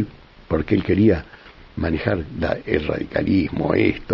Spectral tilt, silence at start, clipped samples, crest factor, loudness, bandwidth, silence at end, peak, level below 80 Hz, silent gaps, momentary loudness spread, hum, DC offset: -9.5 dB/octave; 0 s; under 0.1%; 18 dB; -21 LUFS; 6 kHz; 0 s; -2 dBFS; -38 dBFS; none; 8 LU; none; under 0.1%